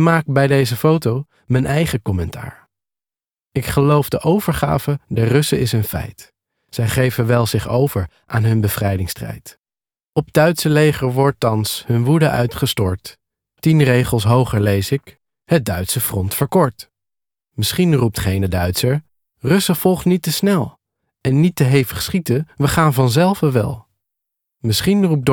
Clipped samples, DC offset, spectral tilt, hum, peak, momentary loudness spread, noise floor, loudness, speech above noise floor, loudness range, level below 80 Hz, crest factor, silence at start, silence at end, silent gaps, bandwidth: under 0.1%; under 0.1%; -6 dB/octave; none; 0 dBFS; 10 LU; under -90 dBFS; -17 LUFS; over 74 dB; 3 LU; -40 dBFS; 16 dB; 0 s; 0 s; 9.59-9.63 s, 10.09-10.13 s; over 20 kHz